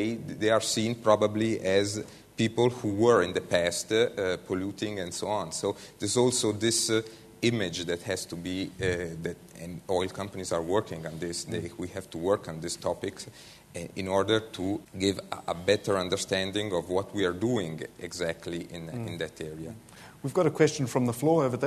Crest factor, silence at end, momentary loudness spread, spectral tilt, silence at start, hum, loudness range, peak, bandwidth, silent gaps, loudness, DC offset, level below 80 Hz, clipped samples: 20 dB; 0 s; 13 LU; -4.5 dB/octave; 0 s; none; 6 LU; -8 dBFS; 13.5 kHz; none; -29 LUFS; under 0.1%; -62 dBFS; under 0.1%